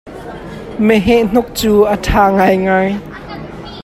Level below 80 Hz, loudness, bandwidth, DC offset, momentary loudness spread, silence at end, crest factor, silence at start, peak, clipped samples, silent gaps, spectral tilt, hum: -30 dBFS; -12 LUFS; 15.5 kHz; under 0.1%; 18 LU; 0 s; 14 dB; 0.05 s; 0 dBFS; under 0.1%; none; -6 dB/octave; none